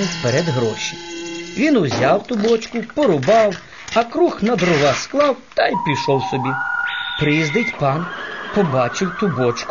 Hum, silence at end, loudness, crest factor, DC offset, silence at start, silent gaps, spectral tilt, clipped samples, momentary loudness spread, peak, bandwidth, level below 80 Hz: none; 0 s; -18 LUFS; 16 dB; 0.4%; 0 s; none; -5 dB/octave; under 0.1%; 9 LU; -2 dBFS; 7.4 kHz; -50 dBFS